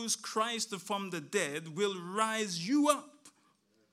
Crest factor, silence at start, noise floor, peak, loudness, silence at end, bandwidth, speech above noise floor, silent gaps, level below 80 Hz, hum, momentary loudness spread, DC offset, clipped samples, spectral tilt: 22 dB; 0 s; -71 dBFS; -12 dBFS; -33 LUFS; 0.65 s; 15.5 kHz; 38 dB; none; under -90 dBFS; none; 7 LU; under 0.1%; under 0.1%; -3 dB/octave